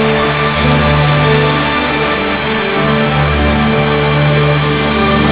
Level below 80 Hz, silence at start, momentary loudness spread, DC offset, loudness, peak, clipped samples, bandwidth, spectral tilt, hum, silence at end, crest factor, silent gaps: -24 dBFS; 0 s; 3 LU; 0.8%; -11 LUFS; 0 dBFS; under 0.1%; 4 kHz; -10 dB/octave; none; 0 s; 12 dB; none